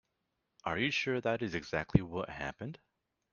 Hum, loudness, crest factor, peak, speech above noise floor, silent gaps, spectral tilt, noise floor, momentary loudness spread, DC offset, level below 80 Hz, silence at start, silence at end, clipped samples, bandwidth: none; -35 LUFS; 28 dB; -8 dBFS; 49 dB; none; -6 dB/octave; -83 dBFS; 13 LU; under 0.1%; -54 dBFS; 0.65 s; 0.55 s; under 0.1%; 7.2 kHz